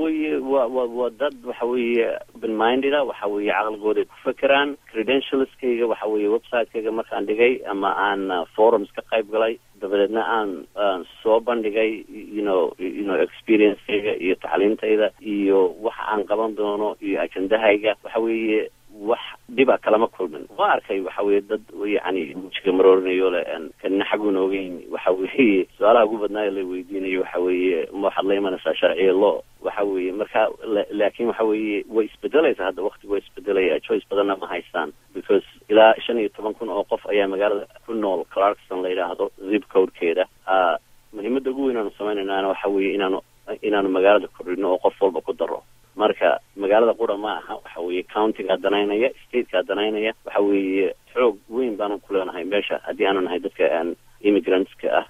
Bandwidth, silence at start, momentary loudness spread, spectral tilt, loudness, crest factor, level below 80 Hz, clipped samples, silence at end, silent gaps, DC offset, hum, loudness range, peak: 13 kHz; 0 s; 9 LU; -6 dB/octave; -22 LUFS; 20 dB; -60 dBFS; under 0.1%; 0.05 s; none; under 0.1%; none; 2 LU; -2 dBFS